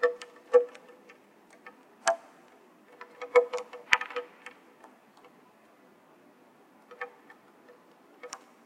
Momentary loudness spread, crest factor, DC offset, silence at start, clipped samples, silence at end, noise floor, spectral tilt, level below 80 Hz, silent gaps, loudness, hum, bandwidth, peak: 26 LU; 34 dB; under 0.1%; 0 s; under 0.1%; 0.3 s; -59 dBFS; -0.5 dB/octave; -80 dBFS; none; -29 LUFS; none; 11.5 kHz; 0 dBFS